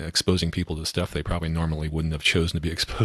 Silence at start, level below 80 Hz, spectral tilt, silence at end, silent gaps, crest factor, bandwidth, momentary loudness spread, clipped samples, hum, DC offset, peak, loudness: 0 s; -36 dBFS; -4.5 dB/octave; 0 s; none; 18 dB; 13.5 kHz; 6 LU; under 0.1%; none; under 0.1%; -6 dBFS; -25 LUFS